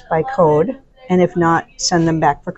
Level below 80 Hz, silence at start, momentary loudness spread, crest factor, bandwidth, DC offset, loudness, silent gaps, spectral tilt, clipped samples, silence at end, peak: -44 dBFS; 0.1 s; 5 LU; 14 dB; 8.2 kHz; under 0.1%; -16 LUFS; none; -5 dB/octave; under 0.1%; 0.05 s; -2 dBFS